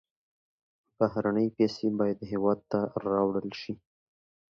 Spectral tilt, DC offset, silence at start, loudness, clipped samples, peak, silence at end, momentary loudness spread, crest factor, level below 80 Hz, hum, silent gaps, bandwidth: -8 dB/octave; under 0.1%; 1 s; -29 LUFS; under 0.1%; -12 dBFS; 0.85 s; 10 LU; 20 dB; -66 dBFS; none; none; 7 kHz